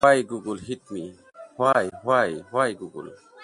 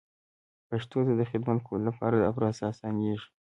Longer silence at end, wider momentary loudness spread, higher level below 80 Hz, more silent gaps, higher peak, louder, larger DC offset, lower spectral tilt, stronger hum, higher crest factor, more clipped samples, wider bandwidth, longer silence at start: second, 0 s vs 0.2 s; first, 19 LU vs 7 LU; about the same, -62 dBFS vs -60 dBFS; neither; first, -4 dBFS vs -12 dBFS; first, -24 LUFS vs -30 LUFS; neither; second, -5 dB/octave vs -8.5 dB/octave; neither; about the same, 20 dB vs 18 dB; neither; first, 11.5 kHz vs 8.8 kHz; second, 0 s vs 0.7 s